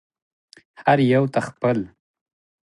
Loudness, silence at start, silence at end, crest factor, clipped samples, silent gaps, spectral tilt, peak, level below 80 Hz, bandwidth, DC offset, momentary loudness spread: -20 LUFS; 0.8 s; 0.85 s; 20 dB; under 0.1%; none; -7.5 dB/octave; -4 dBFS; -62 dBFS; 11.5 kHz; under 0.1%; 9 LU